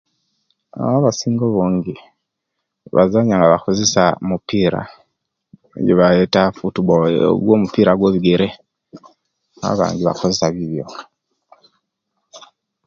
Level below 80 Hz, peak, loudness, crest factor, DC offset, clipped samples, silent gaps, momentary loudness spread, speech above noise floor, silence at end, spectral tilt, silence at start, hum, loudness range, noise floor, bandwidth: -48 dBFS; 0 dBFS; -16 LUFS; 18 dB; under 0.1%; under 0.1%; none; 13 LU; 61 dB; 0.5 s; -5.5 dB/octave; 0.75 s; none; 7 LU; -77 dBFS; 7.6 kHz